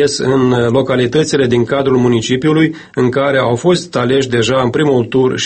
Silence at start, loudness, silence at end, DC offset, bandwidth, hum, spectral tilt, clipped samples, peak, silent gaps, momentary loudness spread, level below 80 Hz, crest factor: 0 s; -13 LUFS; 0 s; under 0.1%; 8.8 kHz; none; -5.5 dB/octave; under 0.1%; 0 dBFS; none; 2 LU; -46 dBFS; 12 dB